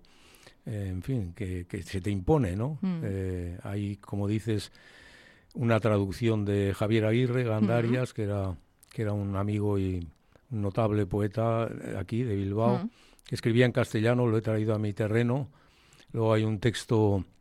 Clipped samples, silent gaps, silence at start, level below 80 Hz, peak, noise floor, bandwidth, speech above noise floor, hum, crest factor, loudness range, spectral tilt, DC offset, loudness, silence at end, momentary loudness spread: under 0.1%; none; 0.45 s; -54 dBFS; -10 dBFS; -58 dBFS; 12.5 kHz; 30 dB; none; 18 dB; 4 LU; -7.5 dB/octave; under 0.1%; -29 LUFS; 0.15 s; 11 LU